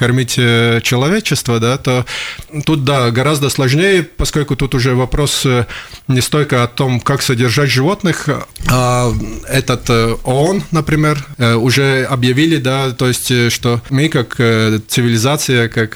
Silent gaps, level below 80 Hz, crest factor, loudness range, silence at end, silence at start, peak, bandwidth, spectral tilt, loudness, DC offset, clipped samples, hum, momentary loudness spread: none; -32 dBFS; 12 dB; 1 LU; 0 s; 0 s; -2 dBFS; over 20 kHz; -5 dB/octave; -13 LUFS; under 0.1%; under 0.1%; none; 5 LU